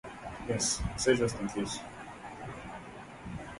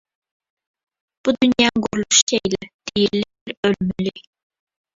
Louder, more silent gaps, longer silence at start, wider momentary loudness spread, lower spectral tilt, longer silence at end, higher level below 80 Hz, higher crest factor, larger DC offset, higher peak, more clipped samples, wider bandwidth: second, -33 LUFS vs -19 LUFS; second, none vs 2.22-2.27 s, 2.74-2.79 s, 3.41-3.46 s, 3.57-3.63 s; second, 0.05 s vs 1.25 s; first, 17 LU vs 11 LU; about the same, -3.5 dB/octave vs -3 dB/octave; second, 0 s vs 0.75 s; about the same, -50 dBFS vs -52 dBFS; about the same, 22 dB vs 20 dB; neither; second, -12 dBFS vs -2 dBFS; neither; first, 11.5 kHz vs 8.2 kHz